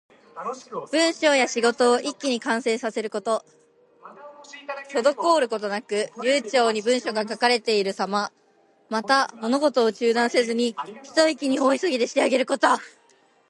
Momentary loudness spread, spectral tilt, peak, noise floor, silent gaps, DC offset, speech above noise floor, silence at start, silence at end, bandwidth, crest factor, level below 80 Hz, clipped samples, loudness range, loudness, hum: 10 LU; -2.5 dB/octave; -4 dBFS; -60 dBFS; none; under 0.1%; 38 dB; 0.35 s; 0.6 s; 11.5 kHz; 20 dB; -78 dBFS; under 0.1%; 4 LU; -23 LUFS; none